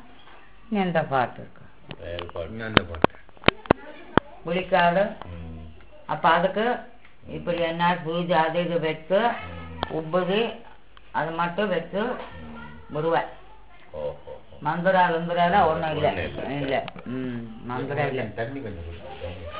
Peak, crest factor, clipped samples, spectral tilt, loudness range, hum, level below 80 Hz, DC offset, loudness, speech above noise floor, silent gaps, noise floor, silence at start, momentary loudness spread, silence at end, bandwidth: 0 dBFS; 26 dB; under 0.1%; -9.5 dB/octave; 5 LU; none; -48 dBFS; 0.6%; -25 LUFS; 26 dB; none; -51 dBFS; 0.25 s; 18 LU; 0 s; 4 kHz